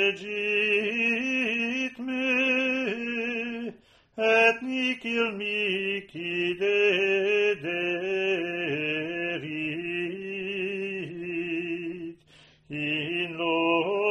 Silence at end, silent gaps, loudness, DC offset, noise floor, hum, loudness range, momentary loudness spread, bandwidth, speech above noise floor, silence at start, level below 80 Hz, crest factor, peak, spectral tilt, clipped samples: 0 s; none; -26 LUFS; under 0.1%; -57 dBFS; none; 6 LU; 10 LU; 10.5 kHz; 30 dB; 0 s; -70 dBFS; 18 dB; -10 dBFS; -5 dB/octave; under 0.1%